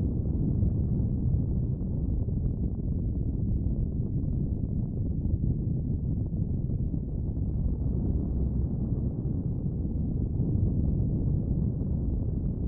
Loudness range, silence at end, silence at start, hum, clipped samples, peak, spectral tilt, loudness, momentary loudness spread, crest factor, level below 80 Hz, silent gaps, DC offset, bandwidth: 1 LU; 0 s; 0 s; none; under 0.1%; -14 dBFS; -17.5 dB/octave; -30 LUFS; 4 LU; 12 dB; -32 dBFS; none; under 0.1%; 1.4 kHz